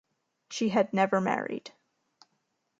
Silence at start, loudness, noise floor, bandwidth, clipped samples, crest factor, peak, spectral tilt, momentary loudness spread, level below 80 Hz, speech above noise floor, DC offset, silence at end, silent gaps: 0.5 s; -28 LUFS; -78 dBFS; 9 kHz; under 0.1%; 20 dB; -10 dBFS; -5.5 dB/octave; 14 LU; -78 dBFS; 50 dB; under 0.1%; 1.1 s; none